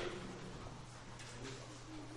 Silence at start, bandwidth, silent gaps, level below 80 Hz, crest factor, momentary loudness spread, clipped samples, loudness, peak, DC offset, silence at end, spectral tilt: 0 s; 11.5 kHz; none; -60 dBFS; 18 dB; 4 LU; under 0.1%; -50 LUFS; -30 dBFS; under 0.1%; 0 s; -4.5 dB/octave